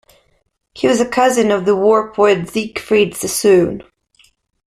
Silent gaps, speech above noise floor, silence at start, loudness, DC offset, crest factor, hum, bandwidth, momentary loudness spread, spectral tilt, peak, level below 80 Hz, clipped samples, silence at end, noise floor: none; 41 dB; 0.75 s; -15 LUFS; under 0.1%; 14 dB; none; 14.5 kHz; 8 LU; -4.5 dB/octave; -2 dBFS; -52 dBFS; under 0.1%; 0.85 s; -55 dBFS